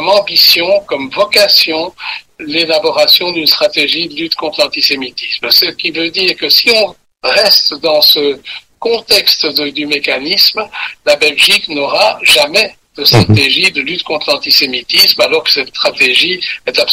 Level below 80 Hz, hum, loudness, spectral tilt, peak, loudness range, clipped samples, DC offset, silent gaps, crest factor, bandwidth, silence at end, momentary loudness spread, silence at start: -46 dBFS; none; -9 LUFS; -3 dB/octave; 0 dBFS; 2 LU; 0.1%; under 0.1%; none; 12 dB; over 20 kHz; 0 s; 10 LU; 0 s